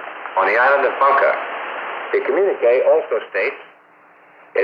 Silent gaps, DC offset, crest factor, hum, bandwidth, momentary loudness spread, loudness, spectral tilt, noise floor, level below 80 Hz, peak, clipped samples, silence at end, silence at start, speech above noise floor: none; under 0.1%; 14 dB; none; 5.2 kHz; 12 LU; -17 LUFS; -5 dB/octave; -49 dBFS; -82 dBFS; -4 dBFS; under 0.1%; 0 s; 0 s; 33 dB